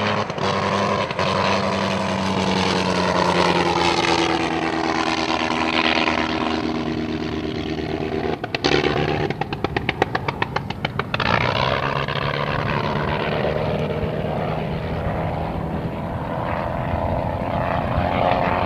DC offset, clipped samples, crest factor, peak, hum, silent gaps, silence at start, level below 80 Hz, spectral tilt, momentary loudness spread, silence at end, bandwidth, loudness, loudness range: under 0.1%; under 0.1%; 20 dB; 0 dBFS; none; none; 0 s; -38 dBFS; -5.5 dB/octave; 7 LU; 0 s; 14 kHz; -21 LUFS; 5 LU